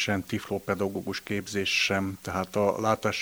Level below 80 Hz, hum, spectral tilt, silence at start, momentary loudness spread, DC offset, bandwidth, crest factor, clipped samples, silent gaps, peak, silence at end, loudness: -60 dBFS; none; -4 dB/octave; 0 s; 8 LU; under 0.1%; over 20 kHz; 18 dB; under 0.1%; none; -10 dBFS; 0 s; -28 LUFS